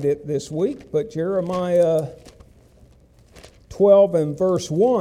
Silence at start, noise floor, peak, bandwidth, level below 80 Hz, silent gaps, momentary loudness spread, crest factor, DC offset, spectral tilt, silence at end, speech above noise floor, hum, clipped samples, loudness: 0 s; -52 dBFS; -4 dBFS; 13 kHz; -52 dBFS; none; 11 LU; 16 dB; under 0.1%; -7 dB/octave; 0 s; 33 dB; none; under 0.1%; -20 LUFS